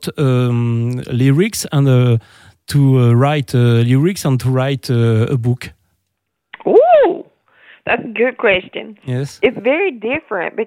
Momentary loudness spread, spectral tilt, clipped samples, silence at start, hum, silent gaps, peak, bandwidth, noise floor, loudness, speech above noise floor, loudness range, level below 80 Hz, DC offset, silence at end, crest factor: 11 LU; -7 dB/octave; under 0.1%; 0 s; none; none; 0 dBFS; 16 kHz; -73 dBFS; -15 LUFS; 59 dB; 3 LU; -52 dBFS; under 0.1%; 0 s; 14 dB